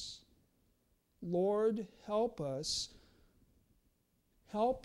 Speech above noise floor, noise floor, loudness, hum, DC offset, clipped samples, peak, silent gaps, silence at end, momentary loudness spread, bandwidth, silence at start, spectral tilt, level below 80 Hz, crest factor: 41 dB; -76 dBFS; -37 LUFS; none; under 0.1%; under 0.1%; -24 dBFS; none; 0.05 s; 14 LU; 13 kHz; 0 s; -4.5 dB/octave; -66 dBFS; 16 dB